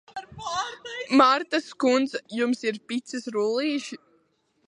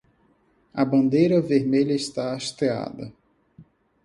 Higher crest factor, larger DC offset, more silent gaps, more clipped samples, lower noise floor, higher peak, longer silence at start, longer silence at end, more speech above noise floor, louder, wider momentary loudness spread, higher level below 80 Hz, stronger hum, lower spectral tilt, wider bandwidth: about the same, 22 dB vs 18 dB; neither; neither; neither; first, -69 dBFS vs -63 dBFS; about the same, -4 dBFS vs -6 dBFS; second, 0.15 s vs 0.75 s; first, 0.7 s vs 0.4 s; about the same, 44 dB vs 41 dB; second, -25 LUFS vs -22 LUFS; about the same, 16 LU vs 16 LU; second, -68 dBFS vs -62 dBFS; neither; second, -3.5 dB/octave vs -6.5 dB/octave; about the same, 11 kHz vs 11.5 kHz